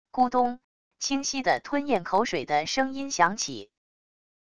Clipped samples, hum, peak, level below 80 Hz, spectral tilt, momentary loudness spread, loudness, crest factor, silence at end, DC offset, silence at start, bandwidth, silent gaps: under 0.1%; none; -6 dBFS; -62 dBFS; -3 dB/octave; 8 LU; -26 LUFS; 20 dB; 0.65 s; 0.4%; 0.05 s; 11 kHz; 0.64-0.91 s